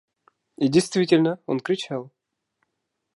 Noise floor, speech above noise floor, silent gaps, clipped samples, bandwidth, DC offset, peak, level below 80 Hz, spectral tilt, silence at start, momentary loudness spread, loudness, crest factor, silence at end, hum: -79 dBFS; 58 dB; none; under 0.1%; 11.5 kHz; under 0.1%; -4 dBFS; -70 dBFS; -5.5 dB/octave; 0.6 s; 10 LU; -22 LUFS; 20 dB; 1.1 s; none